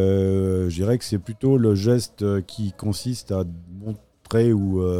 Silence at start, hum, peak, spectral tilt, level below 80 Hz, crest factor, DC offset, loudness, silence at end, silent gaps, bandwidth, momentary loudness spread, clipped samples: 0 s; none; -8 dBFS; -7.5 dB/octave; -48 dBFS; 14 dB; 0.2%; -22 LUFS; 0 s; none; 15.5 kHz; 14 LU; under 0.1%